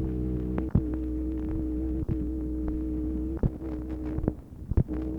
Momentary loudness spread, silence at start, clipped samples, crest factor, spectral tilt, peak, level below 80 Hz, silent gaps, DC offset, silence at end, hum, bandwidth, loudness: 5 LU; 0 s; under 0.1%; 20 dB; -11 dB/octave; -10 dBFS; -34 dBFS; none; 0.1%; 0 s; none; 3.2 kHz; -31 LUFS